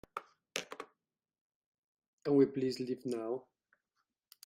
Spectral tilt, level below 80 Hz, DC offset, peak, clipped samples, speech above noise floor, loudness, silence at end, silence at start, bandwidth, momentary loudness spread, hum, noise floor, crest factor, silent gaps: -5.5 dB/octave; -80 dBFS; under 0.1%; -14 dBFS; under 0.1%; 52 dB; -35 LUFS; 1.05 s; 0.15 s; 16 kHz; 19 LU; none; -85 dBFS; 24 dB; 1.41-1.72 s, 1.78-1.95 s, 2.08-2.18 s